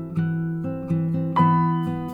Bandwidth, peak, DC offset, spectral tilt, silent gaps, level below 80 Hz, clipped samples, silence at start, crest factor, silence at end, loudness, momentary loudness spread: 4.3 kHz; -6 dBFS; under 0.1%; -10 dB/octave; none; -54 dBFS; under 0.1%; 0 s; 16 dB; 0 s; -23 LUFS; 8 LU